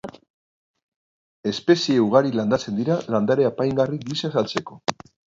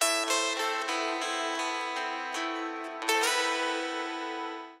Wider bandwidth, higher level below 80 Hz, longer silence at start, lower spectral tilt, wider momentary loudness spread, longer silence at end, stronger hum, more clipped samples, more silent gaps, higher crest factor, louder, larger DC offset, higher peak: second, 7.8 kHz vs 16 kHz; first, -60 dBFS vs under -90 dBFS; about the same, 0.05 s vs 0 s; first, -6 dB/octave vs 3 dB/octave; about the same, 11 LU vs 9 LU; first, 0.45 s vs 0 s; neither; neither; first, 0.30-0.74 s, 0.83-1.43 s vs none; about the same, 18 dB vs 20 dB; first, -22 LUFS vs -30 LUFS; neither; first, -4 dBFS vs -12 dBFS